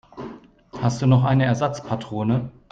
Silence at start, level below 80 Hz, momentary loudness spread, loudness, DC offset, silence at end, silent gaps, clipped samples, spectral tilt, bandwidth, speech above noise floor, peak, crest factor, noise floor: 0.15 s; -52 dBFS; 20 LU; -22 LUFS; under 0.1%; 0.2 s; none; under 0.1%; -7.5 dB/octave; 7.6 kHz; 21 dB; -6 dBFS; 16 dB; -41 dBFS